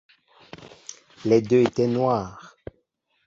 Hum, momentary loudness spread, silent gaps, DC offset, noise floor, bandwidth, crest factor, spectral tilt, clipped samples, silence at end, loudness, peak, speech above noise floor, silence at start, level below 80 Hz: none; 25 LU; none; under 0.1%; -71 dBFS; 7.6 kHz; 20 dB; -7 dB/octave; under 0.1%; 0.8 s; -22 LUFS; -4 dBFS; 50 dB; 0.6 s; -58 dBFS